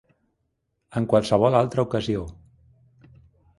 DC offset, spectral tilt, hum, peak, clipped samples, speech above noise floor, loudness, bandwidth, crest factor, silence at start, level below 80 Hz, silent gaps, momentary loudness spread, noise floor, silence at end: under 0.1%; -7 dB/octave; none; -4 dBFS; under 0.1%; 54 dB; -23 LUFS; 11.5 kHz; 22 dB; 0.9 s; -50 dBFS; none; 12 LU; -75 dBFS; 1.25 s